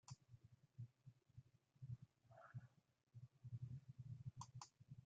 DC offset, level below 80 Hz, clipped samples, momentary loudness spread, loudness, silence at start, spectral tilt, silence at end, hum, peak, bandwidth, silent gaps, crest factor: under 0.1%; -82 dBFS; under 0.1%; 12 LU; -60 LUFS; 0.05 s; -7 dB/octave; 0 s; none; -40 dBFS; 7.6 kHz; none; 20 dB